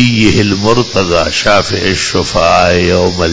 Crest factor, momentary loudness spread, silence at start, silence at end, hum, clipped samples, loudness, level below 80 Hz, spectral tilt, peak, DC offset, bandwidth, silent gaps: 10 dB; 4 LU; 0 s; 0 s; none; 0.7%; -10 LUFS; -26 dBFS; -4.5 dB/octave; 0 dBFS; under 0.1%; 8 kHz; none